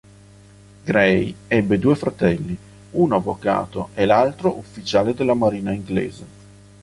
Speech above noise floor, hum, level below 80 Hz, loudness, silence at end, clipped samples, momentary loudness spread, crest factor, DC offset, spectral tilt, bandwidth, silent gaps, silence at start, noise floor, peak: 27 dB; 50 Hz at -40 dBFS; -48 dBFS; -20 LUFS; 0.55 s; under 0.1%; 12 LU; 20 dB; under 0.1%; -7 dB/octave; 11.5 kHz; none; 0.85 s; -46 dBFS; -2 dBFS